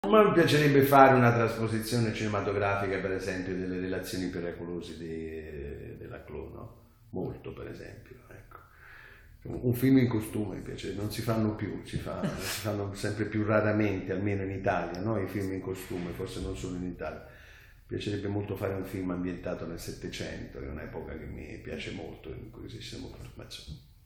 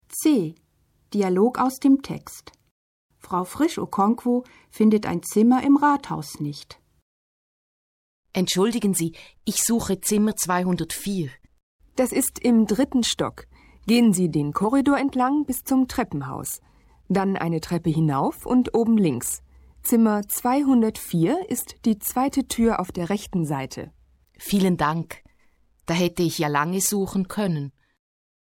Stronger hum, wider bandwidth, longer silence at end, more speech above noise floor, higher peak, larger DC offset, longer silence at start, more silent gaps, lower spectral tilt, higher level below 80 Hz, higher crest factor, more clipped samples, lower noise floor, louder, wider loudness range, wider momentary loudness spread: neither; first, 19.5 kHz vs 17 kHz; second, 0.25 s vs 0.8 s; second, 23 dB vs 43 dB; first, -4 dBFS vs -8 dBFS; neither; about the same, 0.05 s vs 0.1 s; second, none vs 2.71-3.09 s, 7.02-8.23 s, 11.63-11.79 s; first, -6.5 dB/octave vs -5 dB/octave; about the same, -52 dBFS vs -52 dBFS; first, 26 dB vs 14 dB; neither; second, -53 dBFS vs -65 dBFS; second, -30 LUFS vs -23 LUFS; first, 14 LU vs 4 LU; first, 20 LU vs 12 LU